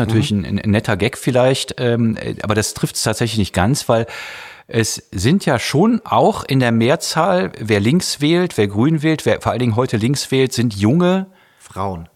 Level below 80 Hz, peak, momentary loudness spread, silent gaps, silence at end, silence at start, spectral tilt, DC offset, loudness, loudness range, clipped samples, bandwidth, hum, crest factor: -46 dBFS; -2 dBFS; 6 LU; none; 0.1 s; 0 s; -5.5 dB/octave; under 0.1%; -17 LUFS; 3 LU; under 0.1%; 16 kHz; none; 14 dB